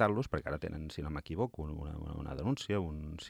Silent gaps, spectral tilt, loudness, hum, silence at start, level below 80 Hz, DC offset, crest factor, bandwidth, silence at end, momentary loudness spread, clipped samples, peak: none; -7 dB/octave; -38 LUFS; none; 0 s; -50 dBFS; under 0.1%; 22 dB; 15 kHz; 0 s; 8 LU; under 0.1%; -14 dBFS